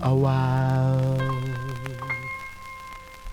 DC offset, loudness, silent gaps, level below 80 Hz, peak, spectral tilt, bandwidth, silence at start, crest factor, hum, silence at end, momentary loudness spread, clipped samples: under 0.1%; -25 LUFS; none; -48 dBFS; -10 dBFS; -8 dB/octave; 10.5 kHz; 0 s; 14 dB; none; 0 s; 17 LU; under 0.1%